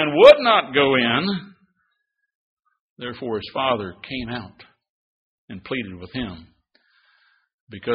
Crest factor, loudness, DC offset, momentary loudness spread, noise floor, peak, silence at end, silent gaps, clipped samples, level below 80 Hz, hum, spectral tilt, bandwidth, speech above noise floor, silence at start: 22 dB; -19 LUFS; under 0.1%; 22 LU; -74 dBFS; 0 dBFS; 0 s; 2.35-2.57 s, 2.80-2.96 s, 4.89-5.48 s, 7.54-7.67 s; under 0.1%; -54 dBFS; none; -2.5 dB/octave; 5.2 kHz; 55 dB; 0 s